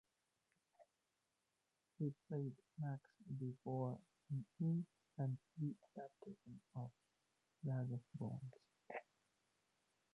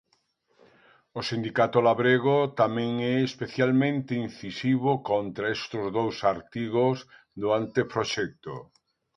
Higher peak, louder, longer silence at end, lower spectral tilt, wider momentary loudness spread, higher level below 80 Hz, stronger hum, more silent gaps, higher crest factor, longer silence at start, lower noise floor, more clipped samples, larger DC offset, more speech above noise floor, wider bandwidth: second, -32 dBFS vs -8 dBFS; second, -49 LUFS vs -26 LUFS; first, 1.15 s vs 0.55 s; first, -10.5 dB/octave vs -6.5 dB/octave; about the same, 12 LU vs 12 LU; second, -86 dBFS vs -64 dBFS; neither; neither; about the same, 16 dB vs 20 dB; second, 0.8 s vs 1.15 s; first, -89 dBFS vs -70 dBFS; neither; neither; about the same, 41 dB vs 44 dB; second, 6.2 kHz vs 9.6 kHz